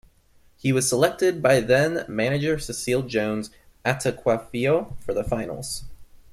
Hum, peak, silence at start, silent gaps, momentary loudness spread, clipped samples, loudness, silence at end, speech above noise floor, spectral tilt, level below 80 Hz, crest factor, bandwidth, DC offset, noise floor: none; -6 dBFS; 0.65 s; none; 10 LU; under 0.1%; -24 LUFS; 0.15 s; 34 dB; -5 dB/octave; -46 dBFS; 18 dB; 15.5 kHz; under 0.1%; -57 dBFS